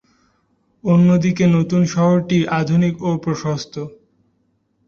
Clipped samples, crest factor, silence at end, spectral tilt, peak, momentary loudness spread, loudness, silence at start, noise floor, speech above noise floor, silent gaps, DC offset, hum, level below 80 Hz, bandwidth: under 0.1%; 14 dB; 1 s; -7.5 dB/octave; -4 dBFS; 12 LU; -17 LUFS; 0.85 s; -65 dBFS; 49 dB; none; under 0.1%; none; -54 dBFS; 7 kHz